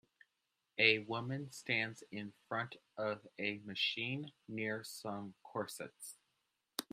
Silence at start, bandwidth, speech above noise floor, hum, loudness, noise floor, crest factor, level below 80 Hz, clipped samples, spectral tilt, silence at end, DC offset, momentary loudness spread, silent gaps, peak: 0.75 s; 15.5 kHz; 46 dB; none; -39 LUFS; -86 dBFS; 28 dB; -84 dBFS; under 0.1%; -3.5 dB/octave; 0.1 s; under 0.1%; 16 LU; none; -14 dBFS